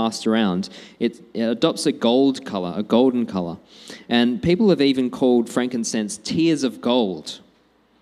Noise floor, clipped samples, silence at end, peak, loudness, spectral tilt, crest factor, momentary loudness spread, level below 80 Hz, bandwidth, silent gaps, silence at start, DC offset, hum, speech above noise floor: -59 dBFS; under 0.1%; 0.65 s; -2 dBFS; -20 LUFS; -5 dB/octave; 18 dB; 13 LU; -56 dBFS; 12.5 kHz; none; 0 s; under 0.1%; none; 39 dB